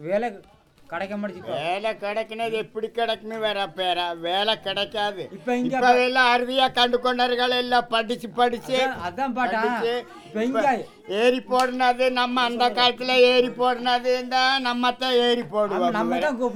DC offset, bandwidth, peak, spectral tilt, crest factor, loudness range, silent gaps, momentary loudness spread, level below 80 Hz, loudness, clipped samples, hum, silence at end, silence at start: under 0.1%; 16 kHz; -4 dBFS; -3.5 dB/octave; 20 dB; 6 LU; none; 10 LU; -60 dBFS; -22 LUFS; under 0.1%; none; 0 s; 0 s